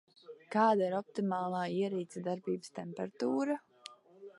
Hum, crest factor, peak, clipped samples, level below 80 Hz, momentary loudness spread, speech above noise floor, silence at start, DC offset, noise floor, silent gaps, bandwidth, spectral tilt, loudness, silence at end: none; 20 dB; -14 dBFS; under 0.1%; -84 dBFS; 23 LU; 22 dB; 0.3 s; under 0.1%; -56 dBFS; none; 11.5 kHz; -6.5 dB/octave; -35 LUFS; 0.1 s